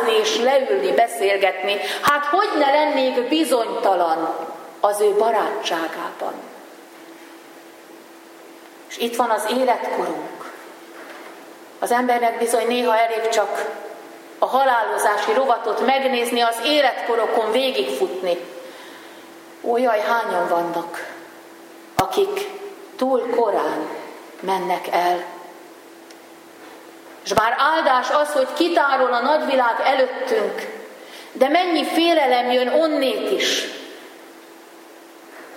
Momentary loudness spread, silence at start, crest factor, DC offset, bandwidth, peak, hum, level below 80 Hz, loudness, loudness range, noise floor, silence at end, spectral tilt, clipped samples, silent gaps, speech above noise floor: 20 LU; 0 s; 20 dB; under 0.1%; 16.5 kHz; -2 dBFS; none; -66 dBFS; -20 LUFS; 6 LU; -43 dBFS; 0 s; -2.5 dB/octave; under 0.1%; none; 24 dB